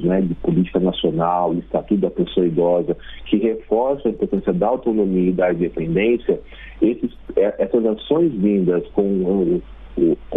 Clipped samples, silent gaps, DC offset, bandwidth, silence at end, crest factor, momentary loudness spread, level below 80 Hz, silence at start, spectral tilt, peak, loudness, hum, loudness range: under 0.1%; none; under 0.1%; 3.9 kHz; 0 s; 16 dB; 5 LU; -42 dBFS; 0 s; -10 dB/octave; -4 dBFS; -19 LUFS; none; 1 LU